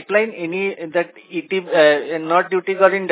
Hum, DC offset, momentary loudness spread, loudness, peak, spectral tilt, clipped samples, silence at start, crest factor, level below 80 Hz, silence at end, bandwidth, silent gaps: none; under 0.1%; 9 LU; -18 LUFS; 0 dBFS; -8.5 dB/octave; under 0.1%; 0 s; 18 dB; -80 dBFS; 0 s; 4 kHz; none